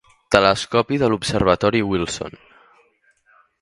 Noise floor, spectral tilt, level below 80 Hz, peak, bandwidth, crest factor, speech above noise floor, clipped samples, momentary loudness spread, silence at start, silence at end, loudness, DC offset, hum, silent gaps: -60 dBFS; -5 dB/octave; -42 dBFS; 0 dBFS; 11.5 kHz; 20 dB; 41 dB; under 0.1%; 10 LU; 0.3 s; 1.35 s; -19 LUFS; under 0.1%; none; none